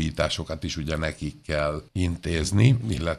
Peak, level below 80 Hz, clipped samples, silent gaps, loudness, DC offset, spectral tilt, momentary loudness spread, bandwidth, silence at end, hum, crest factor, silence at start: -4 dBFS; -38 dBFS; under 0.1%; none; -26 LUFS; under 0.1%; -5.5 dB/octave; 10 LU; 13 kHz; 0 s; none; 20 dB; 0 s